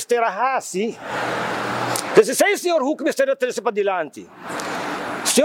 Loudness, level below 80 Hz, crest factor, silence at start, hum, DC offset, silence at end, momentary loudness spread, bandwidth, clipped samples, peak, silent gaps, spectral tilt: -21 LUFS; -66 dBFS; 20 dB; 0 s; none; under 0.1%; 0 s; 10 LU; 17.5 kHz; under 0.1%; 0 dBFS; none; -3 dB/octave